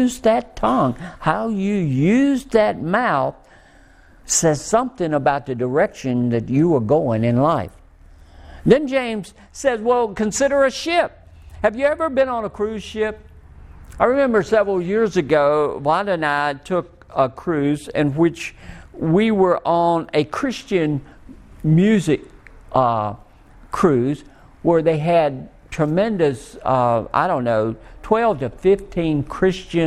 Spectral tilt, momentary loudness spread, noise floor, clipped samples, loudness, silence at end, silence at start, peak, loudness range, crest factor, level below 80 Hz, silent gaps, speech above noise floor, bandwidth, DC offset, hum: -5.5 dB/octave; 8 LU; -48 dBFS; under 0.1%; -19 LUFS; 0 s; 0 s; 0 dBFS; 2 LU; 20 dB; -44 dBFS; none; 30 dB; 14.5 kHz; under 0.1%; none